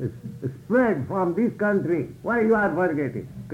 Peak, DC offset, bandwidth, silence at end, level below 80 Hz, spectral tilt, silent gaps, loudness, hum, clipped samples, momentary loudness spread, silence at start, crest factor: -10 dBFS; under 0.1%; 15.5 kHz; 0 s; -56 dBFS; -9 dB/octave; none; -24 LUFS; none; under 0.1%; 13 LU; 0 s; 14 dB